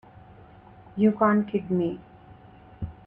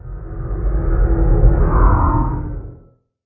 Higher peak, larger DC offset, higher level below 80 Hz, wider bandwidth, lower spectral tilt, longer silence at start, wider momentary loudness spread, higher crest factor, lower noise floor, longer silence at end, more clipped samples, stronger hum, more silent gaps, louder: second, -10 dBFS vs 0 dBFS; neither; second, -54 dBFS vs -16 dBFS; first, 3.4 kHz vs 2.3 kHz; second, -10.5 dB/octave vs -15 dB/octave; first, 0.95 s vs 0.05 s; first, 19 LU vs 16 LU; about the same, 18 dB vs 16 dB; about the same, -50 dBFS vs -48 dBFS; second, 0.15 s vs 0.5 s; neither; neither; neither; second, -24 LUFS vs -17 LUFS